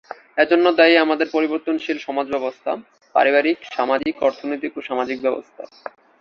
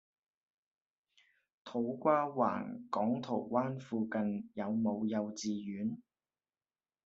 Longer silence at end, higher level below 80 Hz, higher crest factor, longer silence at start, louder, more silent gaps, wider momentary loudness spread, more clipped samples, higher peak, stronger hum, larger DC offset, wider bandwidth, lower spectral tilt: second, 0.55 s vs 1.05 s; first, -64 dBFS vs -80 dBFS; about the same, 18 dB vs 22 dB; second, 0.1 s vs 1.65 s; first, -19 LUFS vs -36 LUFS; neither; first, 16 LU vs 9 LU; neither; first, -2 dBFS vs -16 dBFS; neither; neither; second, 6.6 kHz vs 7.6 kHz; second, -4.5 dB/octave vs -6 dB/octave